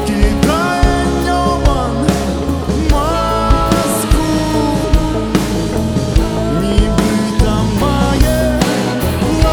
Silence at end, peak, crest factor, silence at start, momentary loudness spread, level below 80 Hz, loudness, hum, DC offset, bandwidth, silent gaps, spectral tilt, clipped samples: 0 s; 0 dBFS; 12 dB; 0 s; 3 LU; -18 dBFS; -14 LUFS; none; under 0.1%; over 20 kHz; none; -5.5 dB/octave; under 0.1%